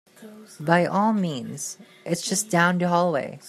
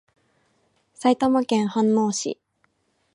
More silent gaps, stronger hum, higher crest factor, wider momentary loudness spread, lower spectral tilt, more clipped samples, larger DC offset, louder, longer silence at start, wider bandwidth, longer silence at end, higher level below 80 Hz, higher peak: neither; neither; about the same, 20 dB vs 18 dB; first, 13 LU vs 9 LU; about the same, -4.5 dB/octave vs -5 dB/octave; neither; neither; about the same, -23 LUFS vs -22 LUFS; second, 0.2 s vs 1 s; first, 14.5 kHz vs 11.5 kHz; second, 0 s vs 0.8 s; about the same, -70 dBFS vs -66 dBFS; about the same, -4 dBFS vs -6 dBFS